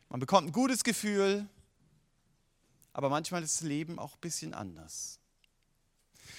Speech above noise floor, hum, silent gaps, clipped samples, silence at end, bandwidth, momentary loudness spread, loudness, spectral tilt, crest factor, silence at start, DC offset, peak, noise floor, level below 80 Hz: 41 dB; none; none; under 0.1%; 0 s; 16.5 kHz; 14 LU; -32 LUFS; -4 dB/octave; 26 dB; 0.1 s; under 0.1%; -8 dBFS; -73 dBFS; -70 dBFS